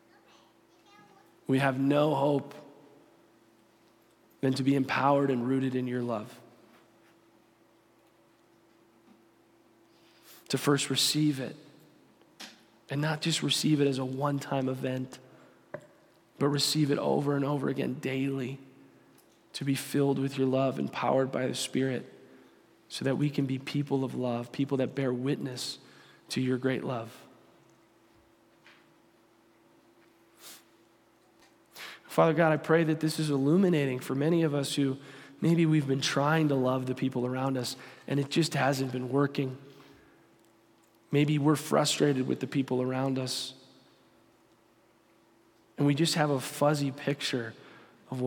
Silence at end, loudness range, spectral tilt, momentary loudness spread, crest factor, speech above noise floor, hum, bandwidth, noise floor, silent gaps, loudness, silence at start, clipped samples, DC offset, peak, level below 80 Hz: 0 s; 7 LU; -5.5 dB/octave; 16 LU; 20 dB; 36 dB; none; 17.5 kHz; -64 dBFS; none; -29 LUFS; 1.5 s; under 0.1%; under 0.1%; -10 dBFS; -78 dBFS